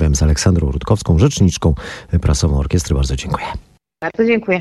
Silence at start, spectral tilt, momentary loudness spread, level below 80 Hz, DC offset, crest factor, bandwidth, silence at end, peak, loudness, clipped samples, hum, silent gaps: 0 s; -6 dB/octave; 11 LU; -24 dBFS; under 0.1%; 14 dB; 12.5 kHz; 0 s; -2 dBFS; -16 LUFS; under 0.1%; none; none